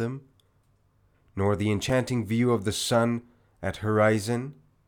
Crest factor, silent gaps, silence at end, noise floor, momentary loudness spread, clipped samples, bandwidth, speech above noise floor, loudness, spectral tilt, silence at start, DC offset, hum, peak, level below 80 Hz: 16 dB; none; 0.35 s; -66 dBFS; 12 LU; under 0.1%; 19 kHz; 40 dB; -26 LUFS; -5.5 dB/octave; 0 s; under 0.1%; none; -10 dBFS; -58 dBFS